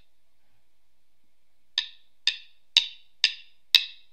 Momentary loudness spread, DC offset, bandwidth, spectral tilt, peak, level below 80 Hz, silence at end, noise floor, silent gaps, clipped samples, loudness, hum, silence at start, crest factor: 18 LU; 0.3%; 15.5 kHz; 4.5 dB/octave; 0 dBFS; -82 dBFS; 0.2 s; -76 dBFS; none; under 0.1%; -24 LUFS; none; 1.75 s; 30 dB